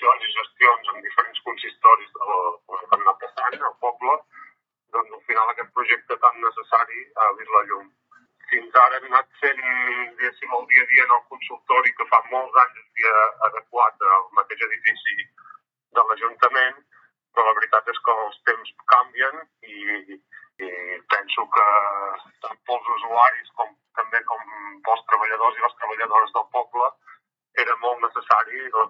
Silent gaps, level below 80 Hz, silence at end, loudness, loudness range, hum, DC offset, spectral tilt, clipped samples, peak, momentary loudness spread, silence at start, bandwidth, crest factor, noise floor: none; under -90 dBFS; 0 s; -20 LUFS; 5 LU; none; under 0.1%; -2.5 dB/octave; under 0.1%; 0 dBFS; 13 LU; 0 s; 5.8 kHz; 22 dB; -59 dBFS